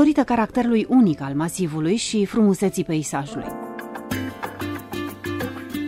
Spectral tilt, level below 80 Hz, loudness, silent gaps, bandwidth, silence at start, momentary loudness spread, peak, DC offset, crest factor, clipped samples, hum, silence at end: -5.5 dB/octave; -52 dBFS; -22 LUFS; none; 16 kHz; 0 s; 13 LU; -4 dBFS; under 0.1%; 18 dB; under 0.1%; none; 0 s